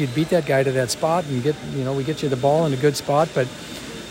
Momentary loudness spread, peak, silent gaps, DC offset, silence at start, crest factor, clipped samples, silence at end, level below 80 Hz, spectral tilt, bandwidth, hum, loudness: 8 LU; -6 dBFS; none; under 0.1%; 0 s; 16 dB; under 0.1%; 0 s; -52 dBFS; -5.5 dB/octave; 16.5 kHz; none; -21 LUFS